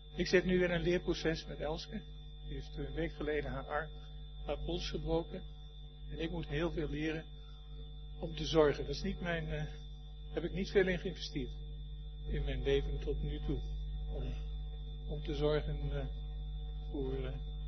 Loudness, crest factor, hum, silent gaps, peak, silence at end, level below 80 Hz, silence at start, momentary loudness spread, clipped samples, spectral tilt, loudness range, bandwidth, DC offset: -38 LUFS; 22 dB; none; none; -16 dBFS; 0 s; -42 dBFS; 0 s; 18 LU; under 0.1%; -5 dB/octave; 5 LU; 6.2 kHz; under 0.1%